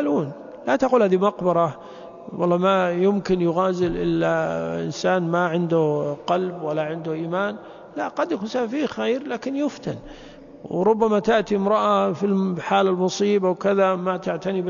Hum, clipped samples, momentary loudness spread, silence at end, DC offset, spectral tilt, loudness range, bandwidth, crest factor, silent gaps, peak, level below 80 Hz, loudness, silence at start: none; under 0.1%; 11 LU; 0 s; under 0.1%; -6.5 dB/octave; 5 LU; 7.4 kHz; 16 dB; none; -6 dBFS; -54 dBFS; -22 LUFS; 0 s